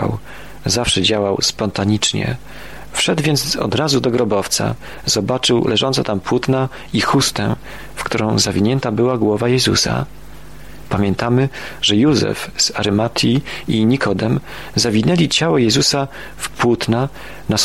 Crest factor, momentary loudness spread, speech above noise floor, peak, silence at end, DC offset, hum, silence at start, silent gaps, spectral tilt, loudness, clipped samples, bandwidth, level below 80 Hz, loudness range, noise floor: 14 dB; 10 LU; 20 dB; -2 dBFS; 0 s; 1%; none; 0 s; none; -4 dB/octave; -17 LUFS; under 0.1%; 16 kHz; -42 dBFS; 2 LU; -37 dBFS